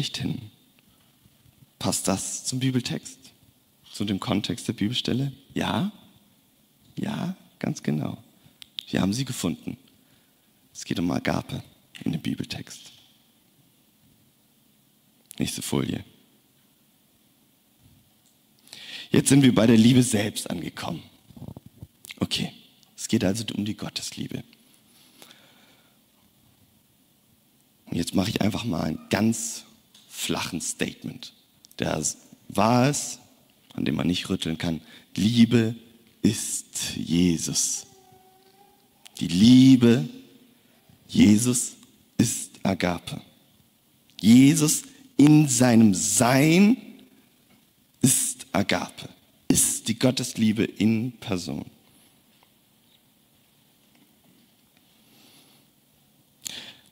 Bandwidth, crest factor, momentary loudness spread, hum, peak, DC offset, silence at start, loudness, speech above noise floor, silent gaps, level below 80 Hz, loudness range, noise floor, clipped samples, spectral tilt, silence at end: 16 kHz; 18 dB; 20 LU; none; -6 dBFS; under 0.1%; 0 s; -23 LUFS; 40 dB; none; -58 dBFS; 14 LU; -62 dBFS; under 0.1%; -4.5 dB/octave; 0.2 s